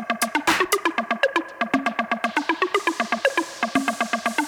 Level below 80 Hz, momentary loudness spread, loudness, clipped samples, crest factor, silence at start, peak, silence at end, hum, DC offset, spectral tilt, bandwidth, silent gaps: -62 dBFS; 4 LU; -23 LUFS; under 0.1%; 20 dB; 0 s; -4 dBFS; 0 s; none; under 0.1%; -2.5 dB/octave; over 20 kHz; none